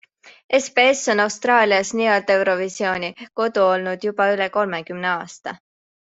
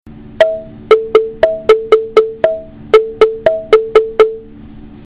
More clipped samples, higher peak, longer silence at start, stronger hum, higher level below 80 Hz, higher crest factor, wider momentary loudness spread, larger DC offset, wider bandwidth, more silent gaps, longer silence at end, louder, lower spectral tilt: second, under 0.1% vs 0.5%; about the same, -2 dBFS vs 0 dBFS; first, 0.25 s vs 0.05 s; neither; second, -66 dBFS vs -40 dBFS; first, 18 dB vs 12 dB; first, 10 LU vs 6 LU; neither; first, 8.2 kHz vs 7 kHz; first, 0.44-0.49 s vs none; first, 0.45 s vs 0.1 s; second, -19 LUFS vs -12 LUFS; second, -3 dB/octave vs -5 dB/octave